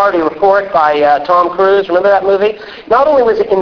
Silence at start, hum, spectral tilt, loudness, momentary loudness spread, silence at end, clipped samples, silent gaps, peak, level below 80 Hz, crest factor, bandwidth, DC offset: 0 s; none; -6.5 dB/octave; -11 LUFS; 3 LU; 0 s; under 0.1%; none; 0 dBFS; -46 dBFS; 10 dB; 5.4 kHz; under 0.1%